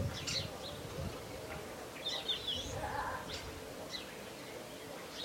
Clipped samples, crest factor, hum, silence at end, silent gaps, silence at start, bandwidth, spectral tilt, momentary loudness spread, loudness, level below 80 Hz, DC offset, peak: under 0.1%; 16 dB; none; 0 s; none; 0 s; 16.5 kHz; -3 dB/octave; 11 LU; -41 LUFS; -58 dBFS; under 0.1%; -26 dBFS